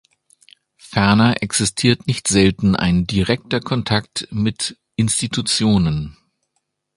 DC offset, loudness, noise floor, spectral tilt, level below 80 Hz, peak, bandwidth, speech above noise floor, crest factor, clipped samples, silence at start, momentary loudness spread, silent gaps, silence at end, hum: under 0.1%; -18 LUFS; -72 dBFS; -4.5 dB/octave; -40 dBFS; 0 dBFS; 11.5 kHz; 55 dB; 18 dB; under 0.1%; 0.85 s; 9 LU; none; 0.85 s; none